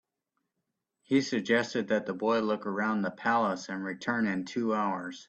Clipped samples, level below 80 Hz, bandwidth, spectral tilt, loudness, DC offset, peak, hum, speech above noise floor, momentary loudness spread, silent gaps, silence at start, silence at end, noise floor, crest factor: under 0.1%; -74 dBFS; 8.4 kHz; -5.5 dB/octave; -30 LUFS; under 0.1%; -12 dBFS; none; 55 dB; 5 LU; none; 1.1 s; 0.05 s; -84 dBFS; 18 dB